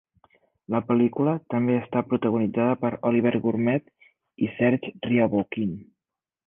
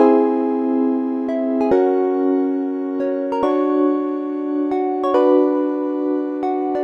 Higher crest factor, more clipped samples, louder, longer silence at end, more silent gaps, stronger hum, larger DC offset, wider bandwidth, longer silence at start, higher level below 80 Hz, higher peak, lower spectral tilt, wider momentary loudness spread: about the same, 16 dB vs 18 dB; neither; second, -24 LUFS vs -19 LUFS; first, 0.65 s vs 0 s; neither; neither; neither; second, 3.6 kHz vs 5.8 kHz; first, 0.7 s vs 0 s; about the same, -62 dBFS vs -60 dBFS; second, -8 dBFS vs 0 dBFS; first, -11 dB/octave vs -7.5 dB/octave; about the same, 7 LU vs 7 LU